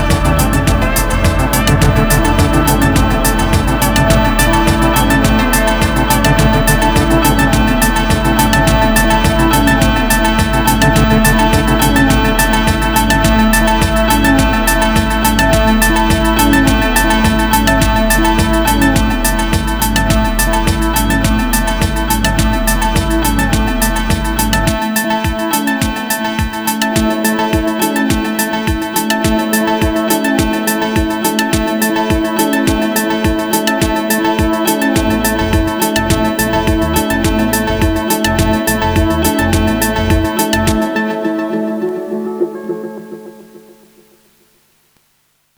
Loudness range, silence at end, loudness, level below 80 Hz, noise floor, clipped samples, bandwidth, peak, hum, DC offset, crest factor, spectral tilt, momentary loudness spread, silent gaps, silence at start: 4 LU; 2 s; -12 LUFS; -20 dBFS; -58 dBFS; under 0.1%; over 20 kHz; 0 dBFS; none; under 0.1%; 12 dB; -4.5 dB/octave; 5 LU; none; 0 s